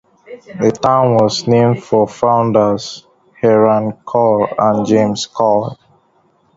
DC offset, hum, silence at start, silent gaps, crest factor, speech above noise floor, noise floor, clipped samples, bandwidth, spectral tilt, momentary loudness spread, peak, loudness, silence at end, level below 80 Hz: under 0.1%; none; 0.3 s; none; 14 dB; 43 dB; -56 dBFS; under 0.1%; 7.8 kHz; -6.5 dB/octave; 6 LU; 0 dBFS; -14 LUFS; 0.8 s; -52 dBFS